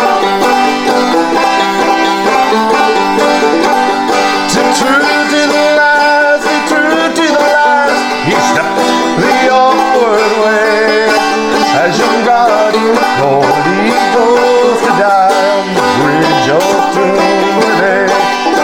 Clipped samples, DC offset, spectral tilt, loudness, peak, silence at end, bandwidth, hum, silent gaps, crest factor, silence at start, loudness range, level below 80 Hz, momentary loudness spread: under 0.1%; under 0.1%; -3.5 dB/octave; -9 LUFS; 0 dBFS; 0 s; 17 kHz; none; none; 10 dB; 0 s; 1 LU; -48 dBFS; 3 LU